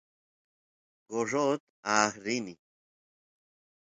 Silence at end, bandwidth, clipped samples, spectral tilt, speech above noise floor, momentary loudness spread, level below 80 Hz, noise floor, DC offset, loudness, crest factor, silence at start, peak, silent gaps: 1.35 s; 9.6 kHz; under 0.1%; -3 dB/octave; over 60 dB; 9 LU; -76 dBFS; under -90 dBFS; under 0.1%; -30 LUFS; 26 dB; 1.1 s; -8 dBFS; 1.60-1.83 s